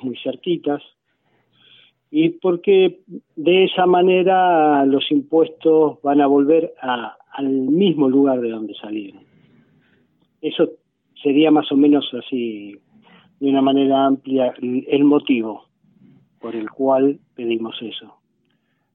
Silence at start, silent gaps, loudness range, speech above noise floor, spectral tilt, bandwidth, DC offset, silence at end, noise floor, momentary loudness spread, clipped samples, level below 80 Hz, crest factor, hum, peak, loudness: 0.05 s; none; 6 LU; 49 dB; -10 dB/octave; 3.9 kHz; under 0.1%; 0.95 s; -67 dBFS; 15 LU; under 0.1%; -72 dBFS; 14 dB; none; -4 dBFS; -18 LUFS